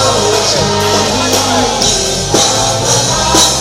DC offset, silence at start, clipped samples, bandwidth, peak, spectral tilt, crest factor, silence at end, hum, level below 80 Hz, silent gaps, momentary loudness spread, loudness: under 0.1%; 0 s; under 0.1%; over 20 kHz; 0 dBFS; -2.5 dB/octave; 12 dB; 0 s; none; -30 dBFS; none; 3 LU; -10 LUFS